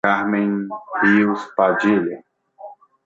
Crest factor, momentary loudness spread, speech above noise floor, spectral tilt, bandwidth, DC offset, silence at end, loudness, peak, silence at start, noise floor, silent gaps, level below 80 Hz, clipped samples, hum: 16 dB; 12 LU; 23 dB; -7.5 dB/octave; 7.6 kHz; under 0.1%; 0.3 s; -19 LUFS; -2 dBFS; 0.05 s; -41 dBFS; none; -64 dBFS; under 0.1%; none